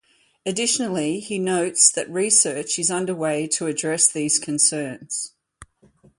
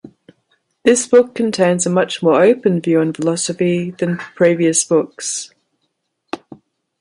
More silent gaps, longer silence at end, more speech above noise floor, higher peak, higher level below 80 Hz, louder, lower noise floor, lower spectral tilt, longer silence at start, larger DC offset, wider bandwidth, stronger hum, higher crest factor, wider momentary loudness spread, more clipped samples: neither; about the same, 0.55 s vs 0.65 s; second, 34 dB vs 56 dB; about the same, -2 dBFS vs 0 dBFS; about the same, -64 dBFS vs -62 dBFS; second, -20 LUFS vs -15 LUFS; second, -56 dBFS vs -71 dBFS; second, -2 dB/octave vs -4.5 dB/octave; first, 0.45 s vs 0.05 s; neither; about the same, 11.5 kHz vs 11.5 kHz; neither; first, 22 dB vs 16 dB; about the same, 13 LU vs 12 LU; neither